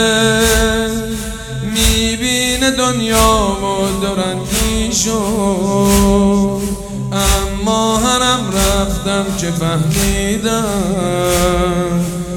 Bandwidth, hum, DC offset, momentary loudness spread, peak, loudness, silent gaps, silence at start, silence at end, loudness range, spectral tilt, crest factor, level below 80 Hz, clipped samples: 19.5 kHz; none; under 0.1%; 7 LU; 0 dBFS; -14 LUFS; none; 0 s; 0 s; 1 LU; -4 dB/octave; 14 dB; -24 dBFS; under 0.1%